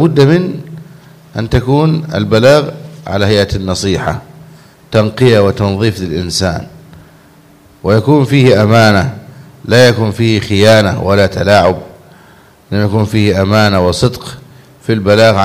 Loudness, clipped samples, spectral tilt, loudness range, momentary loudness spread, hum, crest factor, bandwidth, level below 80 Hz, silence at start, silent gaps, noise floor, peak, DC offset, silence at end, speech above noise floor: -11 LUFS; 0.6%; -6 dB/octave; 4 LU; 15 LU; none; 12 dB; 15.5 kHz; -36 dBFS; 0 s; none; -42 dBFS; 0 dBFS; under 0.1%; 0 s; 33 dB